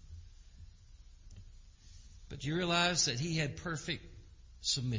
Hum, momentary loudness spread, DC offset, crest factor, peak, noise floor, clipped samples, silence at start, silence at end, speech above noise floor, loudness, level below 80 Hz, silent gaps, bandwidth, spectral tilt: none; 24 LU; under 0.1%; 22 dB; -16 dBFS; -56 dBFS; under 0.1%; 0.05 s; 0 s; 22 dB; -34 LUFS; -54 dBFS; none; 7.8 kHz; -3 dB/octave